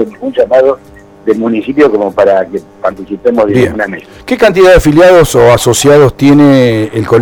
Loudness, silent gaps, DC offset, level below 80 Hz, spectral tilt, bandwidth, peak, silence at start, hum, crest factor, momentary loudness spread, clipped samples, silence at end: -7 LUFS; none; under 0.1%; -28 dBFS; -5.5 dB/octave; over 20 kHz; 0 dBFS; 0 s; none; 8 dB; 13 LU; 2%; 0 s